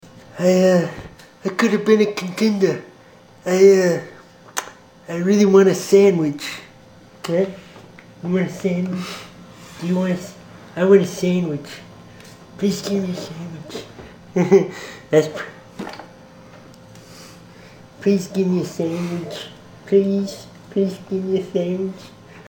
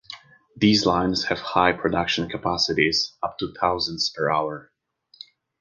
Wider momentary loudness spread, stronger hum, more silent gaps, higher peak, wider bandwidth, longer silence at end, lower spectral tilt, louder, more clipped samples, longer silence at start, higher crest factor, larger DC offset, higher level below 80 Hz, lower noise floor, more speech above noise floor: first, 22 LU vs 10 LU; neither; neither; about the same, 0 dBFS vs -2 dBFS; first, 18 kHz vs 10 kHz; second, 0.05 s vs 0.95 s; first, -6 dB/octave vs -4 dB/octave; first, -19 LUFS vs -22 LUFS; neither; about the same, 0.15 s vs 0.1 s; about the same, 20 dB vs 22 dB; neither; second, -58 dBFS vs -50 dBFS; about the same, -47 dBFS vs -49 dBFS; about the same, 29 dB vs 27 dB